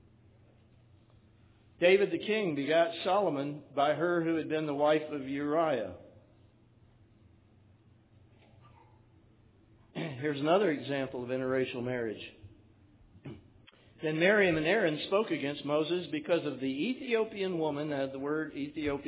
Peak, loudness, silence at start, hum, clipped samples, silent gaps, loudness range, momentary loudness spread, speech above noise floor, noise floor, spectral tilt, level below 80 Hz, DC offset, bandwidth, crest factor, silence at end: -12 dBFS; -31 LUFS; 1.8 s; none; under 0.1%; none; 8 LU; 12 LU; 32 dB; -62 dBFS; -4 dB/octave; -66 dBFS; under 0.1%; 4 kHz; 20 dB; 0 s